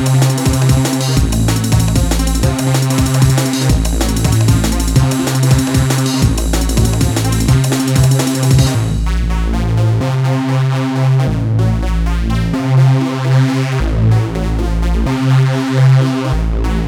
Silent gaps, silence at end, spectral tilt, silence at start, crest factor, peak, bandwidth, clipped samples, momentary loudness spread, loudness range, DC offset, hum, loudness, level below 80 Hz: none; 0 s; -5.5 dB/octave; 0 s; 12 dB; 0 dBFS; 17 kHz; under 0.1%; 5 LU; 1 LU; under 0.1%; none; -13 LUFS; -20 dBFS